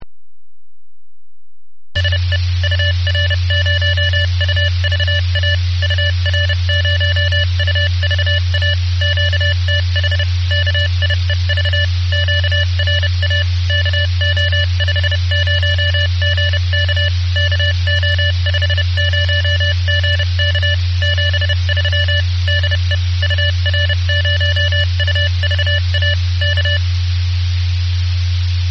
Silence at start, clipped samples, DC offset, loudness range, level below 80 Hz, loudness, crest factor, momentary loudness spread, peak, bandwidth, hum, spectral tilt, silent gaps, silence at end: 0 s; under 0.1%; 0.6%; 1 LU; -34 dBFS; -15 LUFS; 12 dB; 2 LU; -2 dBFS; 6.4 kHz; none; -4 dB/octave; none; 0 s